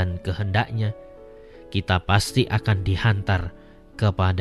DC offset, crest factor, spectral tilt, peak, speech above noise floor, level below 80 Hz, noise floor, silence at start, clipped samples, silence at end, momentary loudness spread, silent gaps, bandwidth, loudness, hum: under 0.1%; 18 dB; -6 dB/octave; -4 dBFS; 22 dB; -40 dBFS; -44 dBFS; 0 s; under 0.1%; 0 s; 9 LU; none; 13 kHz; -23 LUFS; none